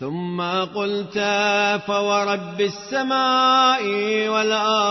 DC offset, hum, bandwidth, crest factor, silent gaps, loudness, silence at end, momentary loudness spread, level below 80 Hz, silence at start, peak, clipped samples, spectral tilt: under 0.1%; none; 6.2 kHz; 14 dB; none; -20 LUFS; 0 s; 8 LU; -66 dBFS; 0 s; -6 dBFS; under 0.1%; -3.5 dB/octave